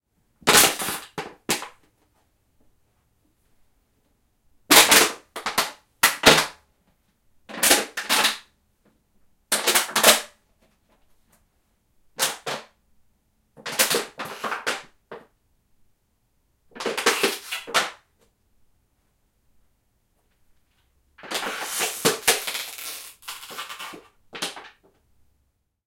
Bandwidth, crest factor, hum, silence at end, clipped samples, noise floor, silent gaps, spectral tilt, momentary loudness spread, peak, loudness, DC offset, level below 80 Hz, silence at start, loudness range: 17 kHz; 26 dB; none; 1.2 s; under 0.1%; -71 dBFS; none; -0.5 dB/octave; 20 LU; 0 dBFS; -20 LUFS; under 0.1%; -58 dBFS; 0.45 s; 15 LU